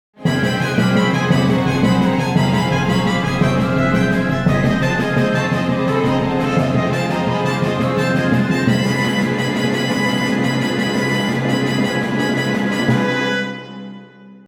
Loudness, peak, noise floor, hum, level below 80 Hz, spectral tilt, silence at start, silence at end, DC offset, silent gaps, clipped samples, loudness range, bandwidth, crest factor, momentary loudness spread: -17 LUFS; -2 dBFS; -40 dBFS; none; -42 dBFS; -6 dB/octave; 0.2 s; 0.1 s; under 0.1%; none; under 0.1%; 2 LU; 16 kHz; 14 dB; 3 LU